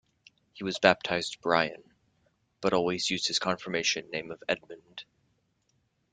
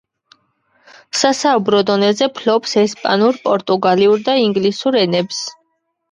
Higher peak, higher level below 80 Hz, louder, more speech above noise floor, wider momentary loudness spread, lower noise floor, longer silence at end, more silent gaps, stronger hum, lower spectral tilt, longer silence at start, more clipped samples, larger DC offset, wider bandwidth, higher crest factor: second, -4 dBFS vs 0 dBFS; about the same, -66 dBFS vs -64 dBFS; second, -29 LUFS vs -15 LUFS; second, 44 dB vs 52 dB; first, 14 LU vs 5 LU; first, -74 dBFS vs -66 dBFS; first, 1.1 s vs 0.6 s; neither; neither; about the same, -3 dB/octave vs -4 dB/octave; second, 0.55 s vs 1.15 s; neither; neither; second, 9.6 kHz vs 11 kHz; first, 28 dB vs 16 dB